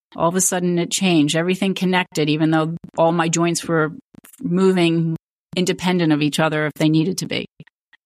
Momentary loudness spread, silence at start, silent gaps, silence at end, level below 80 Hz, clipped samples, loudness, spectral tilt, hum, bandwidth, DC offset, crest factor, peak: 8 LU; 0.15 s; 4.04-4.12 s, 5.23-5.49 s; 0.6 s; -62 dBFS; under 0.1%; -19 LUFS; -4.5 dB/octave; none; 15.5 kHz; under 0.1%; 14 dB; -6 dBFS